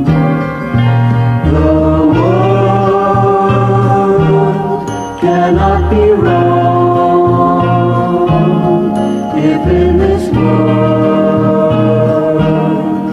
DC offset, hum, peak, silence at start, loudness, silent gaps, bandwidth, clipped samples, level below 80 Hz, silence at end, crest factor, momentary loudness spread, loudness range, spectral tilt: under 0.1%; none; 0 dBFS; 0 s; -10 LUFS; none; 10.5 kHz; under 0.1%; -26 dBFS; 0 s; 10 dB; 4 LU; 1 LU; -9 dB/octave